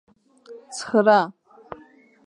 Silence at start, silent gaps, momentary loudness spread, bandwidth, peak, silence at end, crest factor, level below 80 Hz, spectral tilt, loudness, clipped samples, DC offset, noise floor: 0.5 s; none; 25 LU; 11 kHz; -2 dBFS; 0.95 s; 22 dB; -70 dBFS; -4.5 dB/octave; -19 LUFS; under 0.1%; under 0.1%; -52 dBFS